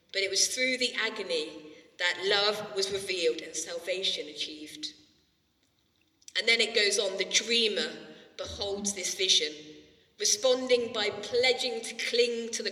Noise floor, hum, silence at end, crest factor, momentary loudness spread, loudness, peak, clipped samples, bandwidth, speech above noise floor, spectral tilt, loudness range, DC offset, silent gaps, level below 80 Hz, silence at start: -71 dBFS; none; 0 s; 20 dB; 13 LU; -28 LUFS; -10 dBFS; under 0.1%; 15 kHz; 42 dB; -0.5 dB/octave; 6 LU; under 0.1%; none; -66 dBFS; 0.15 s